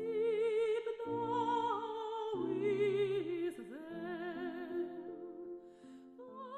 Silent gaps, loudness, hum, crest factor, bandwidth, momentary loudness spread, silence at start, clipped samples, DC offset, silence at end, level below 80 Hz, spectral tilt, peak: none; -38 LUFS; none; 14 dB; 11 kHz; 17 LU; 0 s; under 0.1%; under 0.1%; 0 s; -78 dBFS; -6.5 dB/octave; -24 dBFS